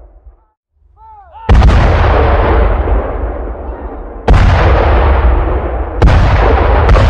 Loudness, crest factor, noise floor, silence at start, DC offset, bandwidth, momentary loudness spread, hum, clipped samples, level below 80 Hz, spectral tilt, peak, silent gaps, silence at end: -11 LUFS; 10 dB; -41 dBFS; 0.25 s; under 0.1%; 7 kHz; 14 LU; none; under 0.1%; -12 dBFS; -7.5 dB/octave; 0 dBFS; 0.57-0.63 s; 0 s